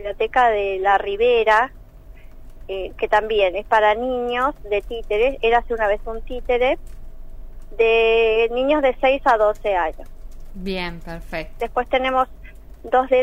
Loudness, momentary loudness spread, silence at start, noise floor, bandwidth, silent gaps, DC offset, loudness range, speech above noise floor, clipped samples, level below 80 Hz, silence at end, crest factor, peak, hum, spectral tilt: -19 LUFS; 13 LU; 0 s; -40 dBFS; 11 kHz; none; under 0.1%; 4 LU; 21 dB; under 0.1%; -36 dBFS; 0 s; 16 dB; -4 dBFS; none; -5 dB/octave